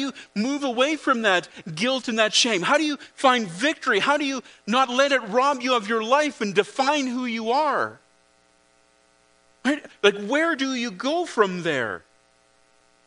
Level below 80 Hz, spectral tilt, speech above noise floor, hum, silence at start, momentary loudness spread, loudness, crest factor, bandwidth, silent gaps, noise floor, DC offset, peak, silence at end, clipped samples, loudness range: -74 dBFS; -3 dB/octave; 38 dB; none; 0 s; 7 LU; -22 LUFS; 22 dB; 10.5 kHz; none; -61 dBFS; under 0.1%; -2 dBFS; 1.1 s; under 0.1%; 5 LU